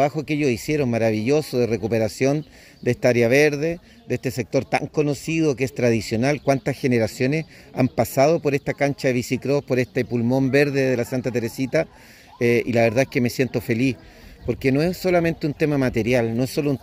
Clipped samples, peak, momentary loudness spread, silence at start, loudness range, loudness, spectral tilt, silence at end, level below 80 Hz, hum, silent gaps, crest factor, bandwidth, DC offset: under 0.1%; -4 dBFS; 7 LU; 0 s; 1 LU; -21 LUFS; -6.5 dB/octave; 0.05 s; -50 dBFS; none; none; 18 dB; 16 kHz; under 0.1%